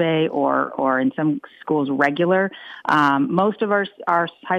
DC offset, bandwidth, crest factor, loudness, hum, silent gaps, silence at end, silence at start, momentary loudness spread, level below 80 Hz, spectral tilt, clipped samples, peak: under 0.1%; 8.6 kHz; 16 dB; -20 LUFS; none; none; 0 s; 0 s; 6 LU; -66 dBFS; -7.5 dB/octave; under 0.1%; -4 dBFS